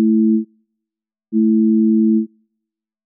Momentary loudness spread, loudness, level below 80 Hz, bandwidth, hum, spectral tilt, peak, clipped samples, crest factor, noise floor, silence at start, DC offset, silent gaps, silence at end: 11 LU; -16 LUFS; under -90 dBFS; 0.4 kHz; none; -21 dB/octave; -8 dBFS; under 0.1%; 10 dB; -85 dBFS; 0 s; under 0.1%; none; 0.8 s